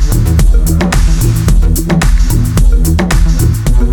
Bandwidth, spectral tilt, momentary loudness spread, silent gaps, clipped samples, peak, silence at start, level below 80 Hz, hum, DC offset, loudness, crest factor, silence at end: 18 kHz; -5.5 dB/octave; 1 LU; none; under 0.1%; 0 dBFS; 0 s; -10 dBFS; none; under 0.1%; -11 LUFS; 8 dB; 0 s